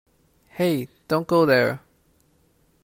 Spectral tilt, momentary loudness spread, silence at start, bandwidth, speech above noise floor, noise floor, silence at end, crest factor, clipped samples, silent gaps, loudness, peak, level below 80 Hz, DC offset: -6.5 dB/octave; 14 LU; 0.55 s; 16.5 kHz; 42 dB; -62 dBFS; 1.05 s; 18 dB; under 0.1%; none; -22 LUFS; -6 dBFS; -64 dBFS; under 0.1%